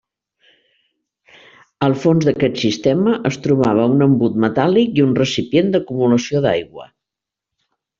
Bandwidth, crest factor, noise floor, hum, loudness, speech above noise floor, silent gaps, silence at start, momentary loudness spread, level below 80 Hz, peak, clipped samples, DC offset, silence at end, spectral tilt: 7.6 kHz; 14 dB; -85 dBFS; none; -16 LUFS; 69 dB; none; 1.8 s; 5 LU; -54 dBFS; -2 dBFS; under 0.1%; under 0.1%; 1.15 s; -6.5 dB/octave